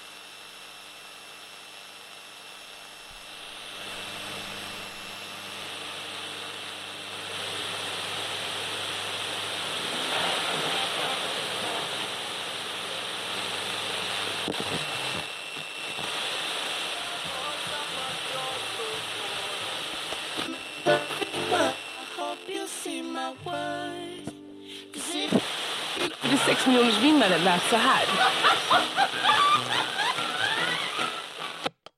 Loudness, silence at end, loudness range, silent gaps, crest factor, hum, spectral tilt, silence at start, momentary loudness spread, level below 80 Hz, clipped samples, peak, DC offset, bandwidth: -27 LUFS; 0.25 s; 15 LU; none; 20 dB; none; -2.5 dB/octave; 0 s; 20 LU; -68 dBFS; under 0.1%; -8 dBFS; under 0.1%; 16 kHz